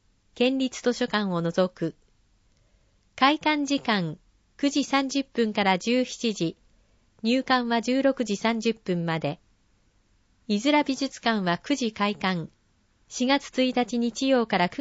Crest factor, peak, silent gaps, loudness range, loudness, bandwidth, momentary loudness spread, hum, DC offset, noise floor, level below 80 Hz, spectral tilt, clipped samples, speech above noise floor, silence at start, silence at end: 22 dB; -4 dBFS; none; 2 LU; -25 LUFS; 8 kHz; 7 LU; none; under 0.1%; -65 dBFS; -62 dBFS; -4.5 dB/octave; under 0.1%; 40 dB; 0.35 s; 0 s